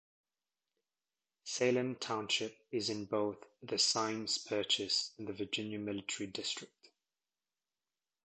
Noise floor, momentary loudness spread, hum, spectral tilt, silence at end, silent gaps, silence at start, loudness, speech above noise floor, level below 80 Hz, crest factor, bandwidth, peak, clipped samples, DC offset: under -90 dBFS; 10 LU; none; -2.5 dB/octave; 1.65 s; none; 1.45 s; -36 LUFS; over 53 dB; -76 dBFS; 20 dB; 9 kHz; -18 dBFS; under 0.1%; under 0.1%